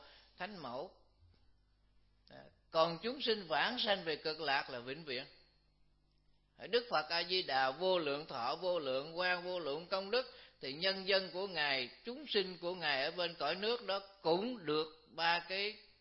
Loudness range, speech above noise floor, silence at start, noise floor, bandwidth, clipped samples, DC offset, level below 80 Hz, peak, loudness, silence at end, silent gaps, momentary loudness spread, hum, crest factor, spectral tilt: 3 LU; 35 dB; 0 s; -72 dBFS; 5.8 kHz; under 0.1%; under 0.1%; -74 dBFS; -18 dBFS; -37 LUFS; 0.2 s; none; 11 LU; none; 22 dB; -0.5 dB/octave